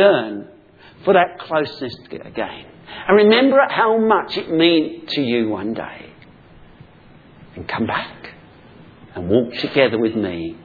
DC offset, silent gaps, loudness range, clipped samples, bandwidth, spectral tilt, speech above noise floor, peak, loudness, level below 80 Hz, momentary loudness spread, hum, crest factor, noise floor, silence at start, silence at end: under 0.1%; none; 12 LU; under 0.1%; 4.9 kHz; -7.5 dB/octave; 28 dB; 0 dBFS; -18 LUFS; -54 dBFS; 19 LU; none; 20 dB; -46 dBFS; 0 s; 0.05 s